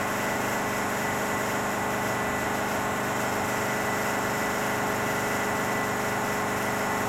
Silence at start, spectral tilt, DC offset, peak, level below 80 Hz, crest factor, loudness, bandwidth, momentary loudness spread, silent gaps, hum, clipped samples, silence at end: 0 s; -3.5 dB/octave; under 0.1%; -14 dBFS; -54 dBFS; 12 dB; -27 LUFS; 16.5 kHz; 1 LU; none; 50 Hz at -65 dBFS; under 0.1%; 0 s